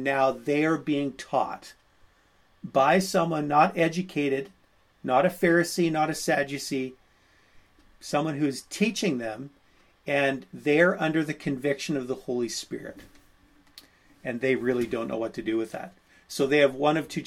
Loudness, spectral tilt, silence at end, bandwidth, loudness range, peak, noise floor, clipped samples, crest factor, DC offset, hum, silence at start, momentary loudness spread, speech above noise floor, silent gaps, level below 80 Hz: -26 LUFS; -5 dB/octave; 0 s; 17 kHz; 6 LU; -6 dBFS; -62 dBFS; under 0.1%; 20 dB; under 0.1%; none; 0 s; 16 LU; 36 dB; none; -62 dBFS